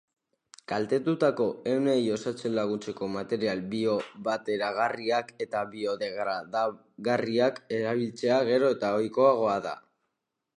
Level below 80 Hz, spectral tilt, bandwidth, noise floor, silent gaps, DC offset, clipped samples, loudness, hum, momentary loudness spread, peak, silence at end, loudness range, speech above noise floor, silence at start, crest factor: -72 dBFS; -6 dB/octave; 10.5 kHz; -83 dBFS; none; under 0.1%; under 0.1%; -28 LUFS; none; 8 LU; -10 dBFS; 0.8 s; 4 LU; 55 dB; 0.7 s; 18 dB